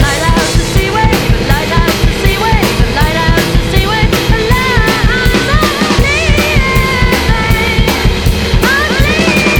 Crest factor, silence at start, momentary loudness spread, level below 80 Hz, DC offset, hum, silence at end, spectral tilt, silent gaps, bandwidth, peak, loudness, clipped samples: 10 dB; 0 s; 2 LU; -14 dBFS; under 0.1%; none; 0 s; -4.5 dB/octave; none; 19.5 kHz; 0 dBFS; -10 LUFS; 0.3%